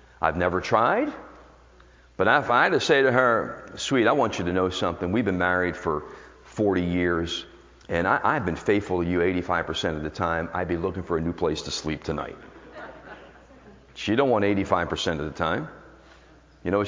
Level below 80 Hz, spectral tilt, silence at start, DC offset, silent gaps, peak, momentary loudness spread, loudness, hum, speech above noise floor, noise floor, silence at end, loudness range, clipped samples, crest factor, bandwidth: -46 dBFS; -5.5 dB/octave; 0.2 s; under 0.1%; none; -4 dBFS; 15 LU; -24 LUFS; none; 29 dB; -53 dBFS; 0 s; 7 LU; under 0.1%; 22 dB; 7.6 kHz